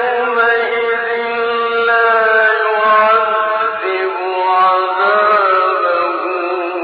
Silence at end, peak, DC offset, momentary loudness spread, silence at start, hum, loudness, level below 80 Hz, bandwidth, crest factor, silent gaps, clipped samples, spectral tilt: 0 s; -2 dBFS; under 0.1%; 7 LU; 0 s; none; -13 LUFS; -60 dBFS; 5.2 kHz; 12 dB; none; under 0.1%; -5.5 dB/octave